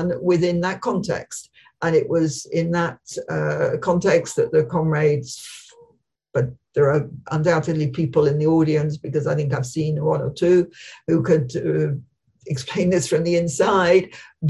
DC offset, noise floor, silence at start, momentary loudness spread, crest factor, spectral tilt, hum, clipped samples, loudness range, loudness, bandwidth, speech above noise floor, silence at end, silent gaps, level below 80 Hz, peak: under 0.1%; -59 dBFS; 0 s; 10 LU; 16 dB; -6.5 dB/octave; none; under 0.1%; 2 LU; -21 LUFS; 12 kHz; 39 dB; 0 s; none; -52 dBFS; -4 dBFS